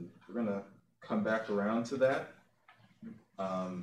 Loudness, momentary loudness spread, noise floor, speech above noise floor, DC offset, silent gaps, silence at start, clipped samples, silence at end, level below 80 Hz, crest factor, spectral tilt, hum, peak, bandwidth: -35 LUFS; 20 LU; -65 dBFS; 31 dB; under 0.1%; none; 0 s; under 0.1%; 0 s; -80 dBFS; 18 dB; -6.5 dB/octave; none; -18 dBFS; 10.5 kHz